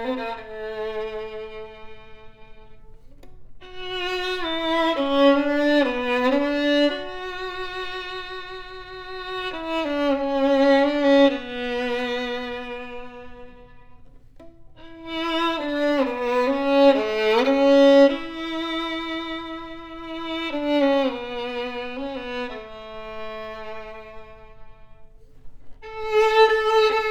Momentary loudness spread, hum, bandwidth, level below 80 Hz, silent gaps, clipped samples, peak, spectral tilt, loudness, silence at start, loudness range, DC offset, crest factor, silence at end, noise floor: 19 LU; none; 9.4 kHz; -48 dBFS; none; under 0.1%; -6 dBFS; -4 dB/octave; -22 LUFS; 0 s; 15 LU; under 0.1%; 18 dB; 0 s; -45 dBFS